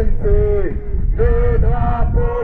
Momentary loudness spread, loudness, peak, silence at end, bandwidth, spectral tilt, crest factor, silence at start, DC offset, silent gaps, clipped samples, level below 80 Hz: 6 LU; -18 LUFS; -2 dBFS; 0 s; 3.2 kHz; -11.5 dB/octave; 12 dB; 0 s; under 0.1%; none; under 0.1%; -16 dBFS